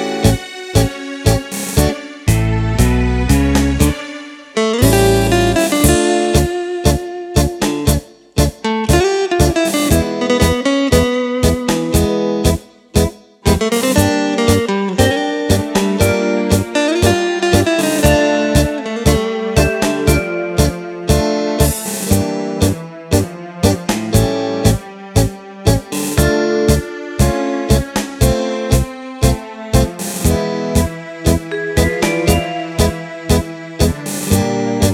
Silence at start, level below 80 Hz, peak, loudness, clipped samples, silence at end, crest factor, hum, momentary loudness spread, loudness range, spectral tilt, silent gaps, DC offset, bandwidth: 0 s; -24 dBFS; 0 dBFS; -15 LUFS; under 0.1%; 0 s; 14 dB; none; 6 LU; 3 LU; -5 dB/octave; none; under 0.1%; 18 kHz